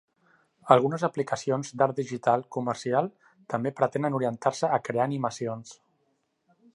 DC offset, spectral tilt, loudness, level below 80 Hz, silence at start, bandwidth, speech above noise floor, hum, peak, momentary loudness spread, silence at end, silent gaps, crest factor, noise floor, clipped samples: under 0.1%; -6 dB/octave; -27 LUFS; -74 dBFS; 0.65 s; 11.5 kHz; 47 dB; none; -2 dBFS; 12 LU; 1 s; none; 26 dB; -73 dBFS; under 0.1%